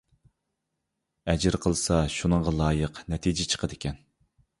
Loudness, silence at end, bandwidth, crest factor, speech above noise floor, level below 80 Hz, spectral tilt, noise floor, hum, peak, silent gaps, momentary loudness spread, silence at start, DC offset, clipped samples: -27 LUFS; 0.65 s; 11.5 kHz; 20 dB; 55 dB; -40 dBFS; -5 dB/octave; -82 dBFS; none; -8 dBFS; none; 11 LU; 1.25 s; under 0.1%; under 0.1%